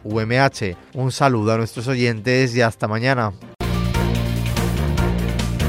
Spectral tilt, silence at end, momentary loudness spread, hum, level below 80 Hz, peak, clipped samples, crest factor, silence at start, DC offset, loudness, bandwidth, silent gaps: -6 dB/octave; 0 s; 7 LU; none; -30 dBFS; -2 dBFS; under 0.1%; 18 dB; 0.05 s; under 0.1%; -20 LUFS; 16 kHz; none